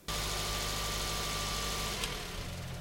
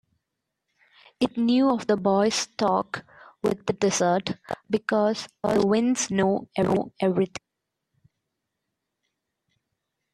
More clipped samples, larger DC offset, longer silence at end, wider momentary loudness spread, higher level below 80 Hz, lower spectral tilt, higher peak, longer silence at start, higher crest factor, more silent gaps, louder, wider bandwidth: neither; neither; second, 0 s vs 2.75 s; about the same, 6 LU vs 8 LU; first, -44 dBFS vs -62 dBFS; second, -2.5 dB/octave vs -5 dB/octave; second, -18 dBFS vs -8 dBFS; second, 0 s vs 1.2 s; about the same, 18 dB vs 18 dB; neither; second, -35 LUFS vs -24 LUFS; first, 17 kHz vs 13 kHz